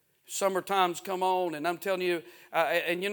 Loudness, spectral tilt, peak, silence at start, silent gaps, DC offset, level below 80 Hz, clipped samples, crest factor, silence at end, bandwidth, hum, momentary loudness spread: -29 LUFS; -3.5 dB/octave; -10 dBFS; 0.3 s; none; under 0.1%; -82 dBFS; under 0.1%; 20 dB; 0 s; 19.5 kHz; none; 5 LU